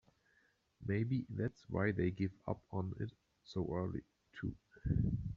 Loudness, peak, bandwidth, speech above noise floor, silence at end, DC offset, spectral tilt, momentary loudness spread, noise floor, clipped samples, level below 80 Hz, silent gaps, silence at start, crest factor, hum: -40 LUFS; -22 dBFS; 7 kHz; 37 dB; 0 s; under 0.1%; -8 dB/octave; 10 LU; -75 dBFS; under 0.1%; -54 dBFS; none; 0.8 s; 18 dB; none